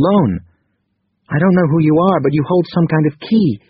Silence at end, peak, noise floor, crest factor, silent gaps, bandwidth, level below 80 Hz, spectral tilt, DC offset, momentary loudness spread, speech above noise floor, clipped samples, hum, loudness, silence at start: 0.15 s; 0 dBFS; -67 dBFS; 14 dB; none; 5.4 kHz; -48 dBFS; -7.5 dB/octave; under 0.1%; 5 LU; 54 dB; under 0.1%; none; -14 LUFS; 0 s